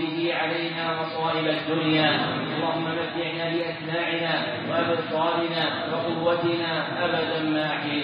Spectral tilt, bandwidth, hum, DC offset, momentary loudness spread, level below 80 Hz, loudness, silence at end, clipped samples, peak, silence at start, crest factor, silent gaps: -3 dB/octave; 5.2 kHz; none; under 0.1%; 4 LU; -68 dBFS; -25 LUFS; 0 s; under 0.1%; -8 dBFS; 0 s; 18 dB; none